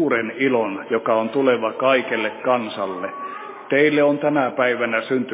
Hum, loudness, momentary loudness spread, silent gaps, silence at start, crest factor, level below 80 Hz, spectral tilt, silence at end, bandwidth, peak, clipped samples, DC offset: none; -20 LUFS; 10 LU; none; 0 s; 18 dB; -74 dBFS; -9 dB/octave; 0 s; 4 kHz; -2 dBFS; under 0.1%; under 0.1%